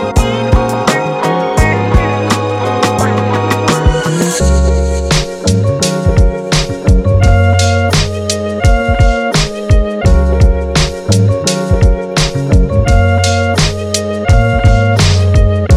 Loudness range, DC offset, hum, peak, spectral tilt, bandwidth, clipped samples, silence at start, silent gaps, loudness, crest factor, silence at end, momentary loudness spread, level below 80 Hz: 1 LU; under 0.1%; none; 0 dBFS; -5.5 dB/octave; 14 kHz; under 0.1%; 0 s; none; -12 LUFS; 10 dB; 0 s; 4 LU; -16 dBFS